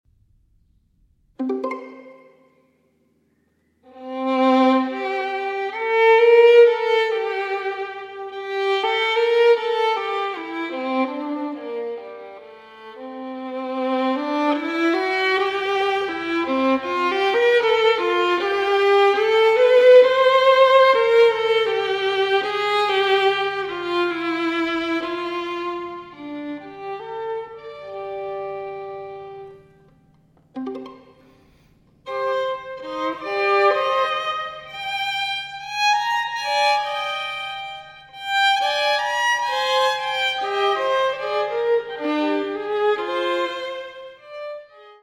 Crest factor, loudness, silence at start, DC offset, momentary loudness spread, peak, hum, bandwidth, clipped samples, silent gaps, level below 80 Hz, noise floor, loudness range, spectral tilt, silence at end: 18 dB; -19 LUFS; 1.4 s; under 0.1%; 18 LU; -2 dBFS; none; 13 kHz; under 0.1%; none; -64 dBFS; -65 dBFS; 16 LU; -3 dB/octave; 0.1 s